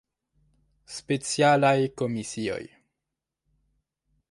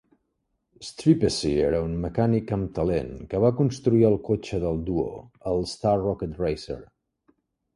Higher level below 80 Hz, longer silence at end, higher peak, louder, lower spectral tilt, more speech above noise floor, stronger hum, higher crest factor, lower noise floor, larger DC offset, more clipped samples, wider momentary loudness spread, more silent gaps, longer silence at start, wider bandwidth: second, -64 dBFS vs -44 dBFS; first, 1.65 s vs 0.9 s; about the same, -8 dBFS vs -6 dBFS; about the same, -25 LUFS vs -25 LUFS; second, -5 dB/octave vs -7 dB/octave; first, 61 dB vs 52 dB; neither; about the same, 20 dB vs 18 dB; first, -86 dBFS vs -76 dBFS; neither; neither; first, 17 LU vs 11 LU; neither; about the same, 0.9 s vs 0.8 s; about the same, 11.5 kHz vs 11.5 kHz